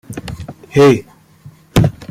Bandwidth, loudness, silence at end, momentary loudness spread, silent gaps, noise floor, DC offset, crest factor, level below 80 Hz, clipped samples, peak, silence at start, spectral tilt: 15.5 kHz; -13 LUFS; 0.05 s; 19 LU; none; -42 dBFS; under 0.1%; 16 dB; -34 dBFS; under 0.1%; 0 dBFS; 0.1 s; -6.5 dB/octave